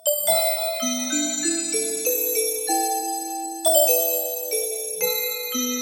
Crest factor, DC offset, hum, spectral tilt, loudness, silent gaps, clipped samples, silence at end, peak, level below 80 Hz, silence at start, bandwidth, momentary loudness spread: 18 dB; under 0.1%; none; 0 dB/octave; -21 LUFS; none; under 0.1%; 0 s; -4 dBFS; -82 dBFS; 0.05 s; 18 kHz; 7 LU